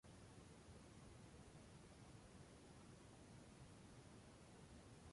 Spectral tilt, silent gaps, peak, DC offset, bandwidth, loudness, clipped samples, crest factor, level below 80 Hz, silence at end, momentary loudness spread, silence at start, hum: -5 dB/octave; none; -50 dBFS; under 0.1%; 11.5 kHz; -64 LUFS; under 0.1%; 14 dB; -72 dBFS; 0 s; 1 LU; 0.05 s; none